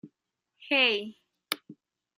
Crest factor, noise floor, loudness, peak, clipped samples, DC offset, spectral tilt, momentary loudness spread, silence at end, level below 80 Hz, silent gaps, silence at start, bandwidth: 26 dB; -82 dBFS; -27 LUFS; -6 dBFS; under 0.1%; under 0.1%; -2 dB/octave; 13 LU; 0.45 s; -86 dBFS; none; 0.05 s; 15 kHz